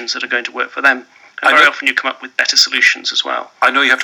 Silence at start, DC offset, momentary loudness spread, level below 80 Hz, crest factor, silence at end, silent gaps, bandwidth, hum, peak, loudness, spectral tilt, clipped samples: 0 s; under 0.1%; 10 LU; -76 dBFS; 14 dB; 0 s; none; 19.5 kHz; none; 0 dBFS; -13 LUFS; 1 dB/octave; under 0.1%